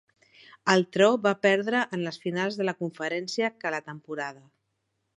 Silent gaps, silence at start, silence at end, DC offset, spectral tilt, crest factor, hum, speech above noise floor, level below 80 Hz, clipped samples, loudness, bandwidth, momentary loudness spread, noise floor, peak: none; 0.65 s; 0.85 s; under 0.1%; -5 dB/octave; 22 dB; none; 51 dB; -78 dBFS; under 0.1%; -26 LUFS; 11 kHz; 13 LU; -78 dBFS; -4 dBFS